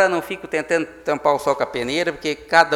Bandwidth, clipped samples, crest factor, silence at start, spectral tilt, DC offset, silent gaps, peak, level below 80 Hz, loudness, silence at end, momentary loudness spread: 17 kHz; under 0.1%; 20 dB; 0 s; -4 dB/octave; under 0.1%; none; 0 dBFS; -54 dBFS; -21 LUFS; 0 s; 7 LU